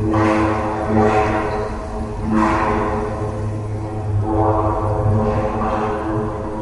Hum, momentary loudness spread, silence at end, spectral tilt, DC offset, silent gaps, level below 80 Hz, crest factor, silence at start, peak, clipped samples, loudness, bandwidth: none; 9 LU; 0 s; -8 dB/octave; under 0.1%; none; -30 dBFS; 16 dB; 0 s; -2 dBFS; under 0.1%; -19 LUFS; 11 kHz